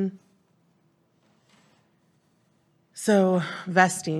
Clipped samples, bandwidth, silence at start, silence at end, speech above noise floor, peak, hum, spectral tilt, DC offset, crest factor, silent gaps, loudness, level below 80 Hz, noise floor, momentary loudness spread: under 0.1%; 13.5 kHz; 0 s; 0 s; 44 dB; -2 dBFS; none; -5 dB/octave; under 0.1%; 26 dB; none; -23 LUFS; -80 dBFS; -66 dBFS; 11 LU